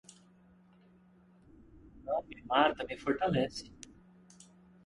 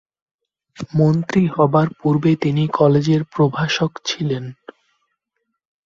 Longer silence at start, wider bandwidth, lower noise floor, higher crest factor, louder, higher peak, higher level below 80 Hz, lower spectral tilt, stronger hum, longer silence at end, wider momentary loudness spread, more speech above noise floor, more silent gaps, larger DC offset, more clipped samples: first, 1.85 s vs 0.8 s; first, 11.5 kHz vs 7.4 kHz; second, -63 dBFS vs -75 dBFS; first, 24 dB vs 18 dB; second, -33 LUFS vs -18 LUFS; second, -12 dBFS vs -2 dBFS; second, -62 dBFS vs -54 dBFS; second, -5 dB/octave vs -7 dB/octave; neither; second, 1.1 s vs 1.35 s; first, 23 LU vs 9 LU; second, 30 dB vs 58 dB; neither; neither; neither